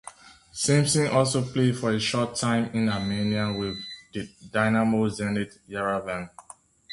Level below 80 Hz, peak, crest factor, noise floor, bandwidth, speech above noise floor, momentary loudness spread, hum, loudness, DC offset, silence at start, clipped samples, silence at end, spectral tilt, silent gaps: -56 dBFS; -6 dBFS; 20 dB; -48 dBFS; 11.5 kHz; 23 dB; 14 LU; none; -25 LUFS; under 0.1%; 0.05 s; under 0.1%; 0 s; -5 dB/octave; none